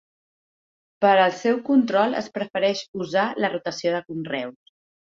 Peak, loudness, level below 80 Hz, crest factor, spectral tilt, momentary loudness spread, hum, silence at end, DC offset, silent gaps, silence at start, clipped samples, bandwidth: -4 dBFS; -23 LUFS; -70 dBFS; 18 dB; -5 dB/octave; 11 LU; none; 0.6 s; under 0.1%; 2.88-2.93 s; 1 s; under 0.1%; 7.6 kHz